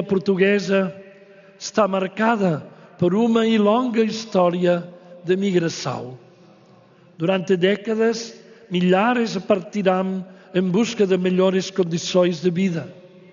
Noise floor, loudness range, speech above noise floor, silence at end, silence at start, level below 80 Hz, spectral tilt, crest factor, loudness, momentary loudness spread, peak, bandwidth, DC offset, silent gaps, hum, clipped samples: -51 dBFS; 4 LU; 31 dB; 0.35 s; 0 s; -66 dBFS; -5.5 dB/octave; 16 dB; -20 LUFS; 11 LU; -4 dBFS; 7.4 kHz; under 0.1%; none; none; under 0.1%